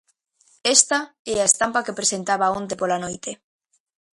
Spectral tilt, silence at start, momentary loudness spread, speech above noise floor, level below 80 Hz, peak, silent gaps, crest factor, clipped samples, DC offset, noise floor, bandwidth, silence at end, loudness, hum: -1 dB/octave; 0.65 s; 14 LU; 40 dB; -60 dBFS; 0 dBFS; 1.19-1.25 s; 24 dB; under 0.1%; under 0.1%; -62 dBFS; 11.5 kHz; 0.8 s; -20 LUFS; none